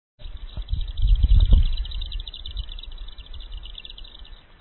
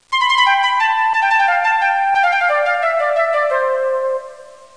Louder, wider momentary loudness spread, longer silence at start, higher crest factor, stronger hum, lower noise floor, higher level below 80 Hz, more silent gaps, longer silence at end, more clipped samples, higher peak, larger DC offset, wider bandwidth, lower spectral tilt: second, -25 LUFS vs -15 LUFS; first, 22 LU vs 5 LU; about the same, 0.2 s vs 0.1 s; first, 20 dB vs 12 dB; neither; first, -43 dBFS vs -38 dBFS; first, -24 dBFS vs -66 dBFS; neither; about the same, 0.25 s vs 0.3 s; neither; about the same, -4 dBFS vs -4 dBFS; second, under 0.1% vs 0.4%; second, 4.3 kHz vs 10.5 kHz; first, -10 dB/octave vs 1.5 dB/octave